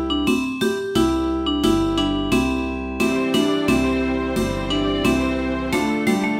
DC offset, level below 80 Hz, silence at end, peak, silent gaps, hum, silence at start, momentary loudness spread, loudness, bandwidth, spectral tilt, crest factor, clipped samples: under 0.1%; -34 dBFS; 0 s; -6 dBFS; none; none; 0 s; 4 LU; -20 LUFS; 16.5 kHz; -5 dB/octave; 14 dB; under 0.1%